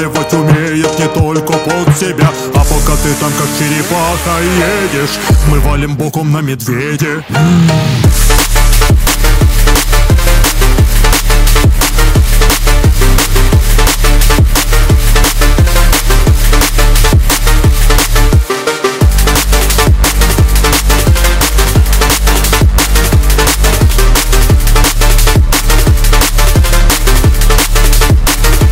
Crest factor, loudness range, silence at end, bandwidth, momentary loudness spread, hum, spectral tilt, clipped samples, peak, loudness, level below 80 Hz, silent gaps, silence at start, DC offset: 8 dB; 2 LU; 0 s; 16.5 kHz; 3 LU; none; -4 dB/octave; 0.3%; 0 dBFS; -10 LUFS; -10 dBFS; none; 0 s; 1%